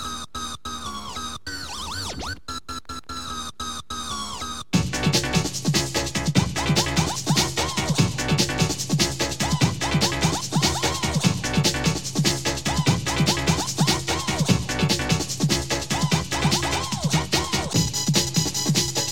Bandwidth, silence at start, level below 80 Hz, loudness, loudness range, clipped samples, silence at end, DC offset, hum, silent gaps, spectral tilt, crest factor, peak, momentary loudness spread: 17 kHz; 0 s; -40 dBFS; -23 LUFS; 9 LU; under 0.1%; 0 s; 0.8%; none; none; -3.5 dB/octave; 18 dB; -6 dBFS; 10 LU